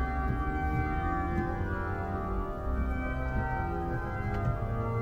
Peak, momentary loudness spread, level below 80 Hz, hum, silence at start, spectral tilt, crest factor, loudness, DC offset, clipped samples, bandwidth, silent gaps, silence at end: -18 dBFS; 3 LU; -36 dBFS; none; 0 s; -9 dB/octave; 12 dB; -33 LUFS; under 0.1%; under 0.1%; 7.4 kHz; none; 0 s